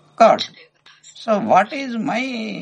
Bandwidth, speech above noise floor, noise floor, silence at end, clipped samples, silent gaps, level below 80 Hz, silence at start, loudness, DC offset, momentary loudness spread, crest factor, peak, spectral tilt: 9 kHz; 28 dB; -45 dBFS; 0 s; under 0.1%; none; -70 dBFS; 0.2 s; -18 LUFS; under 0.1%; 11 LU; 20 dB; 0 dBFS; -5 dB/octave